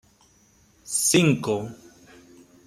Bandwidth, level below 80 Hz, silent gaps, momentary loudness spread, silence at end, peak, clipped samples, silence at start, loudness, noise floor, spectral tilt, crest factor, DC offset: 16 kHz; -62 dBFS; none; 11 LU; 0.9 s; -6 dBFS; under 0.1%; 0.85 s; -22 LUFS; -59 dBFS; -4 dB/octave; 20 dB; under 0.1%